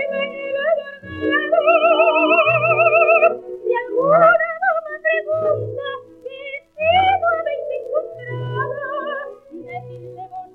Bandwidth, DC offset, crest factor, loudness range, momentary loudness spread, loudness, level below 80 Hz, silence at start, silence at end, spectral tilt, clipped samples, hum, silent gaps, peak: 4.1 kHz; under 0.1%; 16 dB; 7 LU; 19 LU; -17 LUFS; -60 dBFS; 0 s; 0.1 s; -7.5 dB/octave; under 0.1%; none; none; -2 dBFS